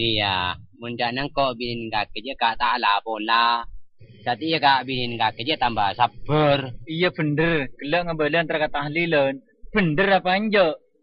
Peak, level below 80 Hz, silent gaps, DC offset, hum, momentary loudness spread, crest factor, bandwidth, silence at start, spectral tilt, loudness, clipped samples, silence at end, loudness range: -4 dBFS; -46 dBFS; none; under 0.1%; none; 8 LU; 18 dB; 5.6 kHz; 0 s; -10 dB/octave; -22 LUFS; under 0.1%; 0.25 s; 2 LU